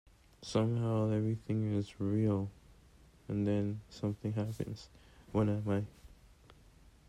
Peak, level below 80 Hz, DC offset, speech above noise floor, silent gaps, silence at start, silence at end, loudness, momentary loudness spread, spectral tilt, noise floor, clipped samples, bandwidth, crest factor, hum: -20 dBFS; -60 dBFS; under 0.1%; 27 dB; none; 0.4 s; 0.95 s; -35 LUFS; 11 LU; -8 dB/octave; -61 dBFS; under 0.1%; 11 kHz; 16 dB; none